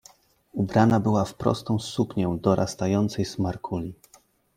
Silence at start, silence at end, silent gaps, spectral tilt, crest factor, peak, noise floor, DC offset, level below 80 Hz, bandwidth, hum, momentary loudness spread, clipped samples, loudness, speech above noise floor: 0.55 s; 0.65 s; none; -7 dB/octave; 18 dB; -6 dBFS; -59 dBFS; under 0.1%; -54 dBFS; 15.5 kHz; none; 11 LU; under 0.1%; -25 LUFS; 35 dB